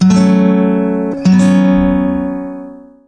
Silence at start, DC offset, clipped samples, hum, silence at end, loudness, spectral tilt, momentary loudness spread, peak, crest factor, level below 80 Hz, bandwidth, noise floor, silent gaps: 0 s; 0.2%; under 0.1%; none; 0.3 s; -11 LUFS; -7.5 dB/octave; 13 LU; -2 dBFS; 10 dB; -34 dBFS; 9.2 kHz; -31 dBFS; none